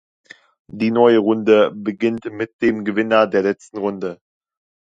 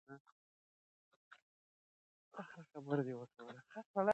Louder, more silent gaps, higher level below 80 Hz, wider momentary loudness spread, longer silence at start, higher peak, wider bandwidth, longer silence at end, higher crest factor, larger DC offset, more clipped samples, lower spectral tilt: first, -18 LUFS vs -45 LUFS; second, 2.53-2.59 s vs 0.20-0.25 s, 0.32-1.31 s, 1.42-2.31 s, 3.86-3.94 s; first, -60 dBFS vs under -90 dBFS; second, 13 LU vs 17 LU; first, 0.75 s vs 0.1 s; first, 0 dBFS vs -22 dBFS; about the same, 7.8 kHz vs 8.2 kHz; first, 0.75 s vs 0 s; about the same, 18 dB vs 22 dB; neither; neither; about the same, -7 dB/octave vs -8 dB/octave